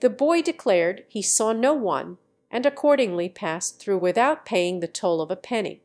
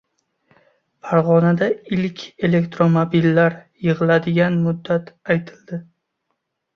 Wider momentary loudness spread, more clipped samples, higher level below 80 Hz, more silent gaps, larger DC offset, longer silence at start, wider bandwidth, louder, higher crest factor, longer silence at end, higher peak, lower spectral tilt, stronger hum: second, 8 LU vs 11 LU; neither; second, -78 dBFS vs -58 dBFS; neither; neither; second, 0 s vs 1.05 s; first, 11 kHz vs 6.4 kHz; second, -23 LUFS vs -18 LUFS; about the same, 16 dB vs 16 dB; second, 0.1 s vs 0.95 s; second, -6 dBFS vs -2 dBFS; second, -3.5 dB/octave vs -8.5 dB/octave; neither